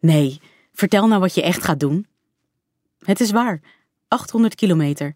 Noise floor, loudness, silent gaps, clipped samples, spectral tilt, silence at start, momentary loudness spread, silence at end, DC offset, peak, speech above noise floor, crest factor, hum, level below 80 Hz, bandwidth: -75 dBFS; -19 LUFS; none; under 0.1%; -6 dB/octave; 0.05 s; 8 LU; 0.05 s; under 0.1%; -2 dBFS; 58 dB; 16 dB; none; -58 dBFS; 16 kHz